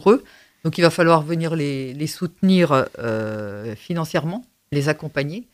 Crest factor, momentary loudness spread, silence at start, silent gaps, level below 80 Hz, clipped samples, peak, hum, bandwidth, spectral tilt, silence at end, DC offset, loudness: 20 dB; 12 LU; 0 s; none; -58 dBFS; under 0.1%; 0 dBFS; none; 15.5 kHz; -6.5 dB/octave; 0.1 s; under 0.1%; -21 LUFS